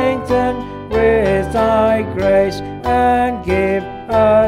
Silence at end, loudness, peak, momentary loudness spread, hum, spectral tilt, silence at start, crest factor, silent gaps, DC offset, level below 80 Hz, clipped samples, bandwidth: 0 s; -16 LUFS; -2 dBFS; 7 LU; none; -7 dB/octave; 0 s; 12 dB; none; under 0.1%; -32 dBFS; under 0.1%; 14 kHz